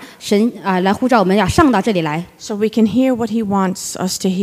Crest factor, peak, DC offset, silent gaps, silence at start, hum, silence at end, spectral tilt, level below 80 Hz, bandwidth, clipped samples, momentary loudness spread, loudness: 14 dB; 0 dBFS; under 0.1%; none; 0 s; none; 0 s; -5.5 dB/octave; -40 dBFS; 15.5 kHz; under 0.1%; 8 LU; -16 LUFS